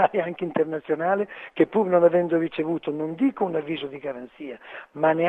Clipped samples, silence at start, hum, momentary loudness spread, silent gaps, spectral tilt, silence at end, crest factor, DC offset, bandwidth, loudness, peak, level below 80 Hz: under 0.1%; 0 s; none; 17 LU; none; -8.5 dB/octave; 0 s; 18 dB; under 0.1%; 4.1 kHz; -24 LUFS; -6 dBFS; -70 dBFS